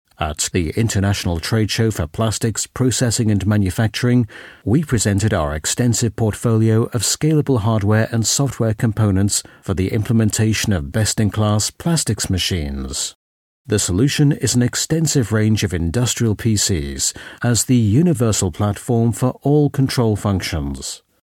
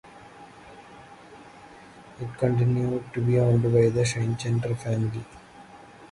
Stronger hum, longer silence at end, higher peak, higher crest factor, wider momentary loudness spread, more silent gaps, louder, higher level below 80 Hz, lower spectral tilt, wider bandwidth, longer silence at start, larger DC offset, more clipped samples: neither; first, 0.25 s vs 0.05 s; first, -4 dBFS vs -8 dBFS; about the same, 14 dB vs 18 dB; second, 5 LU vs 26 LU; first, 13.15-13.65 s vs none; first, -18 LUFS vs -24 LUFS; first, -38 dBFS vs -54 dBFS; second, -5 dB/octave vs -7 dB/octave; first, 16.5 kHz vs 11.5 kHz; first, 0.2 s vs 0.05 s; neither; neither